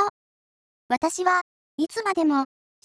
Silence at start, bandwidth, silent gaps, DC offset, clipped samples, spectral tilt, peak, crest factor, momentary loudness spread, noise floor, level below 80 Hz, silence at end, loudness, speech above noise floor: 0 s; 11 kHz; 0.10-0.89 s, 1.41-1.78 s; under 0.1%; under 0.1%; -2.5 dB/octave; -8 dBFS; 18 dB; 8 LU; under -90 dBFS; -68 dBFS; 0.4 s; -25 LUFS; over 67 dB